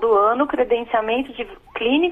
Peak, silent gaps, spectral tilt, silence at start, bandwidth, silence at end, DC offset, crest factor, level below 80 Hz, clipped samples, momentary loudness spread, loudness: -6 dBFS; none; -6 dB/octave; 0 s; 3.8 kHz; 0 s; under 0.1%; 14 dB; -50 dBFS; under 0.1%; 14 LU; -20 LUFS